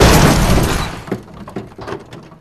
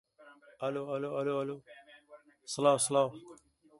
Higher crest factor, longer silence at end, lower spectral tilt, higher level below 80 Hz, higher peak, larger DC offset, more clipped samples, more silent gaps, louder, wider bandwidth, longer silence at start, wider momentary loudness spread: second, 14 dB vs 22 dB; second, 0.2 s vs 0.45 s; about the same, -5 dB/octave vs -4 dB/octave; first, -22 dBFS vs -78 dBFS; first, 0 dBFS vs -12 dBFS; neither; neither; neither; first, -14 LUFS vs -32 LUFS; first, 14 kHz vs 11.5 kHz; second, 0 s vs 0.2 s; about the same, 20 LU vs 18 LU